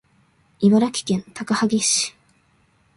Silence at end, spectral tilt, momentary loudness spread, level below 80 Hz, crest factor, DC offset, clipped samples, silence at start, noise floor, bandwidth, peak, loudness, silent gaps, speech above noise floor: 0.9 s; -4 dB/octave; 9 LU; -62 dBFS; 18 dB; under 0.1%; under 0.1%; 0.6 s; -61 dBFS; 11.5 kHz; -4 dBFS; -20 LUFS; none; 41 dB